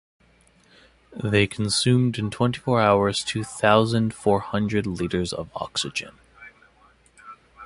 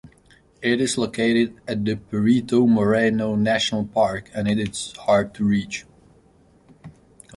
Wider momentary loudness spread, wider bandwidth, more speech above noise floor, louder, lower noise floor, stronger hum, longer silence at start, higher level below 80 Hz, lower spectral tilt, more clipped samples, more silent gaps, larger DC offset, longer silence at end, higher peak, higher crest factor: about the same, 10 LU vs 8 LU; about the same, 11.5 kHz vs 11.5 kHz; about the same, 36 dB vs 35 dB; about the same, -23 LUFS vs -21 LUFS; about the same, -58 dBFS vs -55 dBFS; neither; first, 1.1 s vs 0.05 s; about the same, -50 dBFS vs -52 dBFS; about the same, -5 dB/octave vs -5 dB/octave; neither; neither; neither; second, 0 s vs 0.45 s; first, -2 dBFS vs -6 dBFS; first, 22 dB vs 16 dB